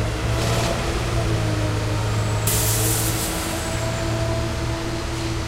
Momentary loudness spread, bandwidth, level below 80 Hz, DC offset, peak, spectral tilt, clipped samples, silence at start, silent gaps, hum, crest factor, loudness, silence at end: 6 LU; 16 kHz; -30 dBFS; under 0.1%; -8 dBFS; -4 dB/octave; under 0.1%; 0 s; none; none; 16 dB; -22 LUFS; 0 s